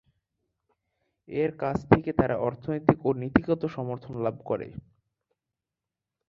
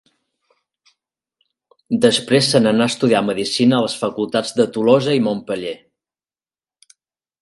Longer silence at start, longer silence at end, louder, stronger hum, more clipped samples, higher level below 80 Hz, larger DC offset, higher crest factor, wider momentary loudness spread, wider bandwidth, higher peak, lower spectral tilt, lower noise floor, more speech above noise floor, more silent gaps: second, 1.3 s vs 1.9 s; second, 1.5 s vs 1.65 s; second, -27 LUFS vs -17 LUFS; neither; neither; first, -50 dBFS vs -62 dBFS; neither; first, 26 dB vs 18 dB; about the same, 11 LU vs 10 LU; second, 7.4 kHz vs 11.5 kHz; about the same, -2 dBFS vs 0 dBFS; first, -9.5 dB/octave vs -5 dB/octave; about the same, -88 dBFS vs under -90 dBFS; second, 62 dB vs over 74 dB; neither